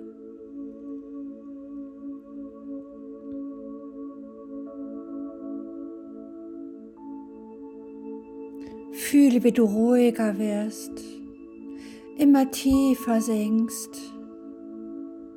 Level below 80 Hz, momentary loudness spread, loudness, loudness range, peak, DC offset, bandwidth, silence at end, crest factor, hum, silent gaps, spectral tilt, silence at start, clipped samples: -56 dBFS; 22 LU; -24 LUFS; 16 LU; -8 dBFS; under 0.1%; 17.5 kHz; 0 s; 18 dB; none; none; -5.5 dB/octave; 0 s; under 0.1%